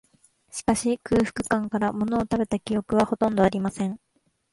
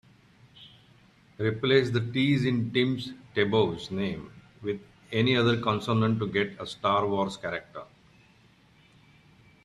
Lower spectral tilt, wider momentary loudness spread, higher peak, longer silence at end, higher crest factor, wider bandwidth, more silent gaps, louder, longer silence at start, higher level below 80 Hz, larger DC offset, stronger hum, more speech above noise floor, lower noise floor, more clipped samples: about the same, -5.5 dB/octave vs -6.5 dB/octave; second, 8 LU vs 12 LU; about the same, -6 dBFS vs -8 dBFS; second, 0.55 s vs 1.8 s; about the same, 18 dB vs 22 dB; about the same, 11.5 kHz vs 11.5 kHz; neither; about the same, -25 LUFS vs -27 LUFS; about the same, 0.55 s vs 0.6 s; first, -50 dBFS vs -62 dBFS; neither; neither; about the same, 34 dB vs 33 dB; about the same, -58 dBFS vs -60 dBFS; neither